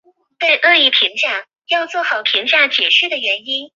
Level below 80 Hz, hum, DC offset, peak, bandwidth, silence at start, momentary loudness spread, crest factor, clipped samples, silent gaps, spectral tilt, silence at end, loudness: -76 dBFS; none; under 0.1%; 0 dBFS; 7.6 kHz; 0.4 s; 9 LU; 16 dB; under 0.1%; none; 0 dB/octave; 0.1 s; -13 LUFS